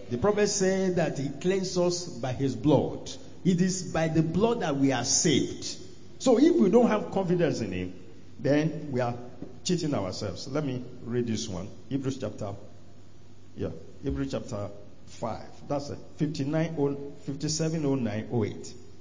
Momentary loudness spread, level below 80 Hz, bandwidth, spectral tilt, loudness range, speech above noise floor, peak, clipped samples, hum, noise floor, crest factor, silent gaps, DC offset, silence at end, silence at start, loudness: 14 LU; -54 dBFS; 7.6 kHz; -5 dB/octave; 11 LU; 26 dB; -10 dBFS; under 0.1%; none; -53 dBFS; 18 dB; none; 0.8%; 0.1 s; 0 s; -28 LUFS